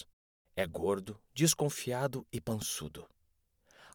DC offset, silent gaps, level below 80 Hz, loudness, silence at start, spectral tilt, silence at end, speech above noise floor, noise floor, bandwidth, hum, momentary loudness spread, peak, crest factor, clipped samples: under 0.1%; 0.13-0.45 s; -62 dBFS; -34 LUFS; 0 s; -4 dB/octave; 0.05 s; 40 dB; -75 dBFS; over 20 kHz; none; 16 LU; -14 dBFS; 22 dB; under 0.1%